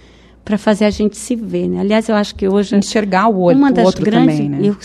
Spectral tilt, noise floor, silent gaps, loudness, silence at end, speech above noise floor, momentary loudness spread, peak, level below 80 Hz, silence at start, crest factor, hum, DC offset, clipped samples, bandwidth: -6 dB/octave; -36 dBFS; none; -14 LUFS; 0.05 s; 22 dB; 7 LU; 0 dBFS; -42 dBFS; 0.45 s; 14 dB; none; under 0.1%; under 0.1%; 12.5 kHz